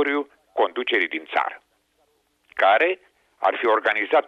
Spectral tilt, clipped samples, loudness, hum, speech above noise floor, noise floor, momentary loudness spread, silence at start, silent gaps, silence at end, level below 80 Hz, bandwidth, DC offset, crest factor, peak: -3.5 dB/octave; under 0.1%; -22 LUFS; none; 45 dB; -66 dBFS; 12 LU; 0 s; none; 0.05 s; -74 dBFS; 7.8 kHz; under 0.1%; 16 dB; -8 dBFS